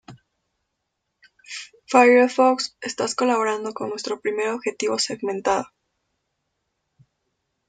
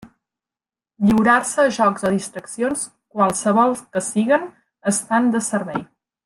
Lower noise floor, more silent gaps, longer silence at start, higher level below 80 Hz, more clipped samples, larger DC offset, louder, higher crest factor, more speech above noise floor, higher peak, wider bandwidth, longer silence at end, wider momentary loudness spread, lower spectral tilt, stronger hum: second, -78 dBFS vs under -90 dBFS; neither; about the same, 0.1 s vs 0 s; second, -68 dBFS vs -54 dBFS; neither; neither; about the same, -21 LUFS vs -19 LUFS; about the same, 20 dB vs 18 dB; second, 57 dB vs over 71 dB; about the same, -4 dBFS vs -2 dBFS; second, 9.4 kHz vs 12.5 kHz; first, 2.05 s vs 0.4 s; first, 18 LU vs 11 LU; second, -3 dB/octave vs -4.5 dB/octave; neither